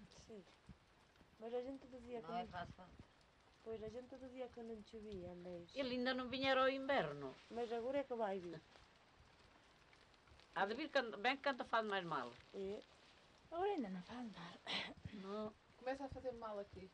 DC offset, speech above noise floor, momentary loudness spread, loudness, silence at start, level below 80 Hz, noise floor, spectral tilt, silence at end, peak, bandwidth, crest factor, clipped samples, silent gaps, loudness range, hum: under 0.1%; 26 dB; 16 LU; -45 LUFS; 0 s; -72 dBFS; -71 dBFS; -5 dB/octave; 0.05 s; -26 dBFS; 10 kHz; 20 dB; under 0.1%; none; 10 LU; none